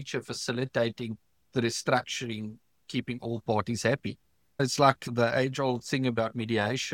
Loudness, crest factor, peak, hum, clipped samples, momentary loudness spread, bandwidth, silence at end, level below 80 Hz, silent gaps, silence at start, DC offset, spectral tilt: -29 LUFS; 22 dB; -6 dBFS; none; under 0.1%; 14 LU; 16.5 kHz; 0 s; -66 dBFS; none; 0 s; under 0.1%; -5 dB/octave